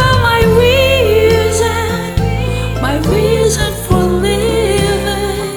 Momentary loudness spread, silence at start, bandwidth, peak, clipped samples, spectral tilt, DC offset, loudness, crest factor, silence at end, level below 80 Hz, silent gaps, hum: 7 LU; 0 s; over 20 kHz; 0 dBFS; under 0.1%; -5 dB/octave; under 0.1%; -12 LUFS; 12 dB; 0 s; -22 dBFS; none; none